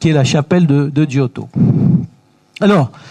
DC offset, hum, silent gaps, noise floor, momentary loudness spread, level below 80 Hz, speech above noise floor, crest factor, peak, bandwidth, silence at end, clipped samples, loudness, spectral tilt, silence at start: under 0.1%; none; none; -47 dBFS; 6 LU; -48 dBFS; 35 dB; 12 dB; 0 dBFS; 10 kHz; 0.25 s; under 0.1%; -14 LUFS; -7 dB/octave; 0 s